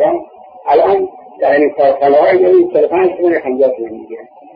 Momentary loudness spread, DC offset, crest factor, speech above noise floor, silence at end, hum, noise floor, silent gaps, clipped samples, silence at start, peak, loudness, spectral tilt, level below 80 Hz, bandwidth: 16 LU; under 0.1%; 10 dB; 21 dB; 0.3 s; none; -32 dBFS; none; under 0.1%; 0 s; -2 dBFS; -12 LUFS; -8.5 dB/octave; -56 dBFS; 5.2 kHz